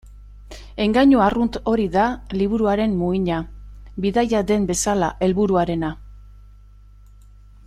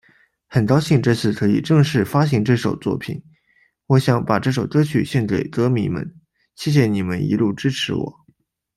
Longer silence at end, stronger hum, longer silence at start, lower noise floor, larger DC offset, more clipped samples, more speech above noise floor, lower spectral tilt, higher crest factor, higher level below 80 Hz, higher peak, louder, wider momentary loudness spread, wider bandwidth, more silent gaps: first, 1.35 s vs 0.65 s; first, 50 Hz at -35 dBFS vs none; second, 0.05 s vs 0.5 s; second, -45 dBFS vs -61 dBFS; neither; neither; second, 27 dB vs 43 dB; second, -5.5 dB/octave vs -7 dB/octave; about the same, 16 dB vs 16 dB; first, -40 dBFS vs -52 dBFS; about the same, -4 dBFS vs -2 dBFS; about the same, -20 LUFS vs -19 LUFS; about the same, 12 LU vs 10 LU; about the same, 13.5 kHz vs 13.5 kHz; neither